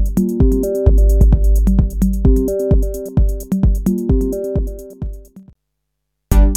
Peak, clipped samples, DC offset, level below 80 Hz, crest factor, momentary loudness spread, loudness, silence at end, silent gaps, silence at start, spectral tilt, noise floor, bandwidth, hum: 0 dBFS; under 0.1%; under 0.1%; -16 dBFS; 14 dB; 9 LU; -16 LUFS; 0 s; none; 0 s; -9 dB/octave; -74 dBFS; 15 kHz; none